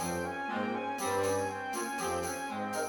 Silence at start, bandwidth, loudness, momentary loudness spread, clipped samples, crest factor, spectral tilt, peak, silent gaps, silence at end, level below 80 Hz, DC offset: 0 s; 19 kHz; -34 LUFS; 5 LU; under 0.1%; 14 dB; -3.5 dB/octave; -20 dBFS; none; 0 s; -64 dBFS; under 0.1%